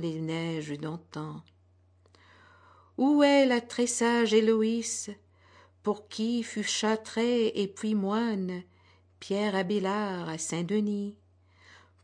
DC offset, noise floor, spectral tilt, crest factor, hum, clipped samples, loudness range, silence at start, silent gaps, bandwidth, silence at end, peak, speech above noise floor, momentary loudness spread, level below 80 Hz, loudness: under 0.1%; -63 dBFS; -4.5 dB/octave; 18 dB; none; under 0.1%; 6 LU; 0 s; none; 10.5 kHz; 0.9 s; -12 dBFS; 35 dB; 15 LU; -76 dBFS; -29 LUFS